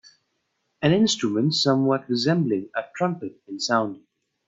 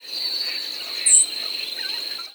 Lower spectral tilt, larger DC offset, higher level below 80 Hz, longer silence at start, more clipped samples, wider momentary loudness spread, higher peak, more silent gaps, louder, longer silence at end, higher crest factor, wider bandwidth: first, -5 dB/octave vs 4 dB/octave; neither; first, -62 dBFS vs -86 dBFS; first, 0.8 s vs 0 s; neither; about the same, 11 LU vs 13 LU; about the same, -4 dBFS vs -2 dBFS; neither; second, -23 LUFS vs -19 LUFS; first, 0.5 s vs 0 s; about the same, 20 dB vs 22 dB; second, 8 kHz vs over 20 kHz